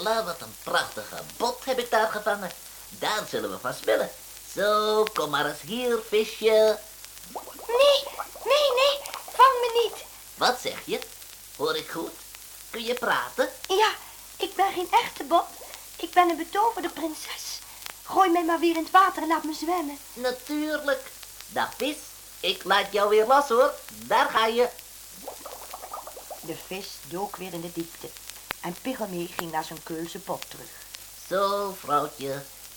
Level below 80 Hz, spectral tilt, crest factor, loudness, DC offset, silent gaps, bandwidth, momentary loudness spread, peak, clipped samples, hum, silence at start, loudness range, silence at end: -60 dBFS; -2.5 dB/octave; 20 dB; -26 LUFS; under 0.1%; none; over 20 kHz; 18 LU; -6 dBFS; under 0.1%; none; 0 s; 10 LU; 0 s